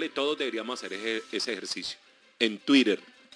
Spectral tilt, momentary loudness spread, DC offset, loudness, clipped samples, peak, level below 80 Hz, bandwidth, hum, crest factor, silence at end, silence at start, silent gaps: -3 dB/octave; 12 LU; under 0.1%; -28 LUFS; under 0.1%; -8 dBFS; -76 dBFS; 10.5 kHz; none; 22 dB; 0.3 s; 0 s; none